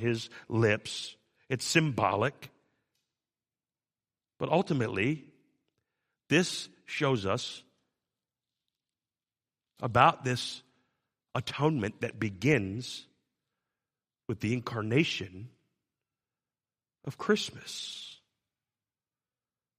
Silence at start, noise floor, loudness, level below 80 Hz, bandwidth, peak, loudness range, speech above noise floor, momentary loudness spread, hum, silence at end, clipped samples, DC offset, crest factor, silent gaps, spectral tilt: 0 s; under -90 dBFS; -30 LUFS; -68 dBFS; 15 kHz; -6 dBFS; 6 LU; over 60 dB; 15 LU; none; 1.65 s; under 0.1%; under 0.1%; 28 dB; none; -5 dB/octave